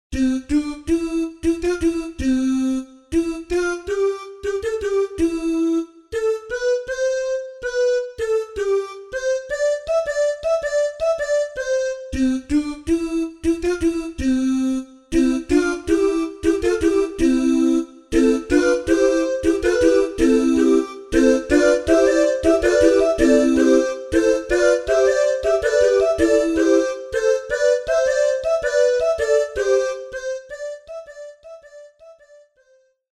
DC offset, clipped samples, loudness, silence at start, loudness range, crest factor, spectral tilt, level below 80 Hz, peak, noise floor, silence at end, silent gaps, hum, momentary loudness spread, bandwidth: under 0.1%; under 0.1%; -19 LUFS; 0.1 s; 6 LU; 16 dB; -4.5 dB/octave; -40 dBFS; -2 dBFS; -59 dBFS; 1 s; none; none; 8 LU; 12.5 kHz